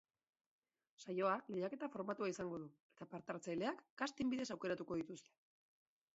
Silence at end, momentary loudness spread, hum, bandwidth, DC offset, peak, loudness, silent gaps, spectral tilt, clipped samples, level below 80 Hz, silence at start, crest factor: 0.95 s; 14 LU; none; 7.6 kHz; under 0.1%; -24 dBFS; -44 LUFS; 2.80-2.90 s, 3.90-3.97 s; -4.5 dB/octave; under 0.1%; -80 dBFS; 1 s; 20 dB